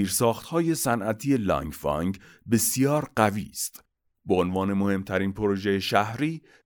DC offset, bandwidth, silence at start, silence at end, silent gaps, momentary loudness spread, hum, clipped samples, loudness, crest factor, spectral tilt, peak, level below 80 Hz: under 0.1%; over 20 kHz; 0 s; 0.25 s; none; 7 LU; none; under 0.1%; -26 LUFS; 20 dB; -5 dB/octave; -6 dBFS; -52 dBFS